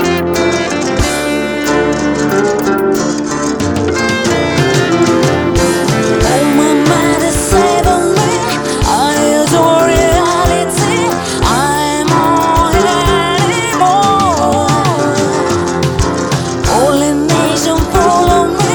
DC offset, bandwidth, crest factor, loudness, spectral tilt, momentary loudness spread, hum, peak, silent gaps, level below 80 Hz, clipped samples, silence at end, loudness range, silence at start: under 0.1%; 19.5 kHz; 10 dB; -11 LUFS; -4.5 dB/octave; 4 LU; none; 0 dBFS; none; -26 dBFS; under 0.1%; 0 s; 2 LU; 0 s